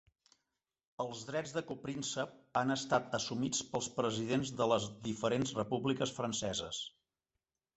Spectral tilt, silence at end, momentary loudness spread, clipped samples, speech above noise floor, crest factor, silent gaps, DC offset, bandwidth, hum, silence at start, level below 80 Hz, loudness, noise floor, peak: -4 dB/octave; 0.85 s; 9 LU; under 0.1%; over 54 dB; 22 dB; none; under 0.1%; 8.2 kHz; none; 1 s; -68 dBFS; -36 LUFS; under -90 dBFS; -16 dBFS